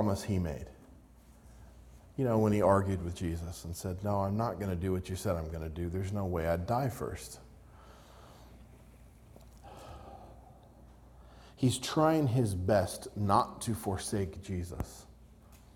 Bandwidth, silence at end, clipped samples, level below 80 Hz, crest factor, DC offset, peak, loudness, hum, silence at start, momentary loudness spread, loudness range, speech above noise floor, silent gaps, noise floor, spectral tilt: 17 kHz; 0.2 s; under 0.1%; -54 dBFS; 22 dB; under 0.1%; -12 dBFS; -33 LUFS; none; 0 s; 22 LU; 22 LU; 25 dB; none; -57 dBFS; -6.5 dB/octave